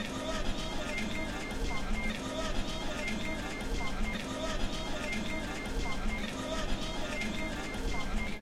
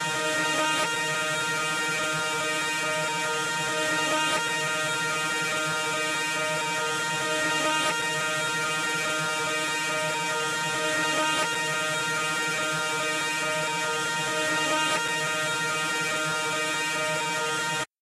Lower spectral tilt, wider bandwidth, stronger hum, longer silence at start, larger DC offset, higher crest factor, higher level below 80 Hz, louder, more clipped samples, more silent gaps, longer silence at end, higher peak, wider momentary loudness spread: first, -4 dB/octave vs -1.5 dB/octave; about the same, 15 kHz vs 16 kHz; neither; about the same, 0 s vs 0 s; neither; about the same, 14 dB vs 12 dB; first, -38 dBFS vs -68 dBFS; second, -36 LUFS vs -25 LUFS; neither; neither; second, 0 s vs 0.15 s; second, -20 dBFS vs -14 dBFS; about the same, 2 LU vs 2 LU